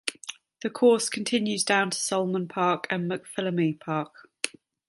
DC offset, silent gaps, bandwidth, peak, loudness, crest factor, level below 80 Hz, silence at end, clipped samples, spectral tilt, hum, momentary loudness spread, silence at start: under 0.1%; none; 12 kHz; -4 dBFS; -26 LUFS; 24 dB; -76 dBFS; 0.4 s; under 0.1%; -4 dB/octave; none; 12 LU; 0.05 s